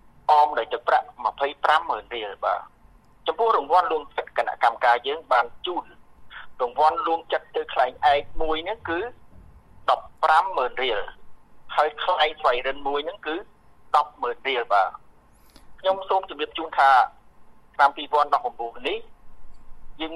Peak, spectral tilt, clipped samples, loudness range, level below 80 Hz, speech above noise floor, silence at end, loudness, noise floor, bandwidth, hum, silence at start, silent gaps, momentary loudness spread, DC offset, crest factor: -4 dBFS; -3.5 dB/octave; under 0.1%; 3 LU; -48 dBFS; 30 dB; 0 s; -23 LUFS; -53 dBFS; 11.5 kHz; none; 0.3 s; none; 11 LU; under 0.1%; 20 dB